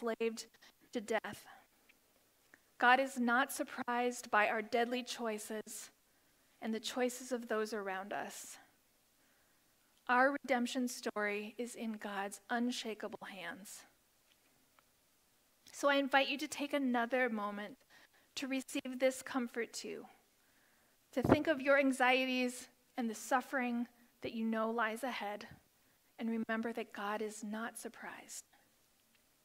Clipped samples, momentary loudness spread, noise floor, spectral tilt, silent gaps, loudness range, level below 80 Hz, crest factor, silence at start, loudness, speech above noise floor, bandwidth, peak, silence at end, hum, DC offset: under 0.1%; 17 LU; -73 dBFS; -3.5 dB/octave; none; 8 LU; -72 dBFS; 26 dB; 0 s; -37 LUFS; 36 dB; 16 kHz; -14 dBFS; 1.05 s; none; under 0.1%